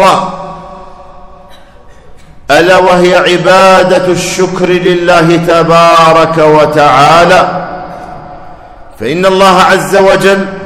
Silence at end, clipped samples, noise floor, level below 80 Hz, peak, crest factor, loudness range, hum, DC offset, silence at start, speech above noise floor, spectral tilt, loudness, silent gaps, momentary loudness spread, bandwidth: 0 s; 9%; -33 dBFS; -36 dBFS; 0 dBFS; 8 dB; 4 LU; none; under 0.1%; 0 s; 28 dB; -4.5 dB/octave; -5 LUFS; none; 18 LU; 18.5 kHz